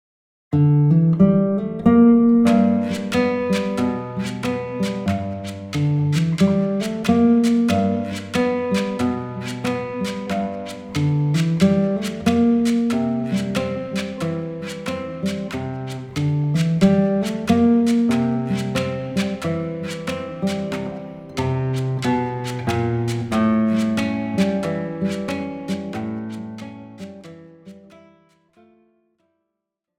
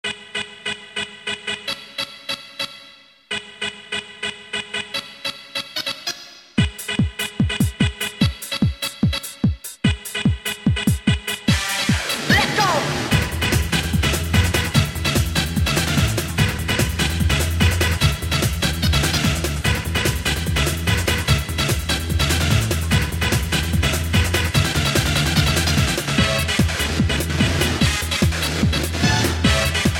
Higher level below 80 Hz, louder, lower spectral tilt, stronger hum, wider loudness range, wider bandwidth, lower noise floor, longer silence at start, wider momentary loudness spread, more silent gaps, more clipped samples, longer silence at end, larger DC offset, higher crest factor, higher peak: second, -54 dBFS vs -28 dBFS; about the same, -20 LUFS vs -20 LUFS; first, -7 dB/octave vs -4 dB/octave; neither; about the same, 8 LU vs 9 LU; second, 14 kHz vs 17 kHz; first, -81 dBFS vs -46 dBFS; first, 0.5 s vs 0.05 s; first, 12 LU vs 9 LU; neither; neither; first, 2.2 s vs 0 s; neither; about the same, 16 dB vs 18 dB; about the same, -4 dBFS vs -2 dBFS